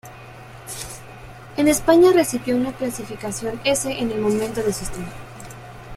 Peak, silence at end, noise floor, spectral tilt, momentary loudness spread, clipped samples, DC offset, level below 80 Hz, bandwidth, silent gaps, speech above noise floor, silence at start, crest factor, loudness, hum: -4 dBFS; 0 s; -40 dBFS; -4.5 dB/octave; 24 LU; under 0.1%; under 0.1%; -46 dBFS; 16 kHz; none; 20 dB; 0.05 s; 18 dB; -20 LUFS; none